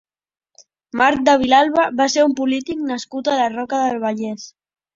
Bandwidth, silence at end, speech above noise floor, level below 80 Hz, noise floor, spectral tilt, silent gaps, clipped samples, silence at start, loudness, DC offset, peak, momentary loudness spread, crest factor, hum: 7.8 kHz; 0.45 s; 36 dB; -56 dBFS; -53 dBFS; -3.5 dB/octave; none; under 0.1%; 0.95 s; -17 LUFS; under 0.1%; -2 dBFS; 13 LU; 16 dB; none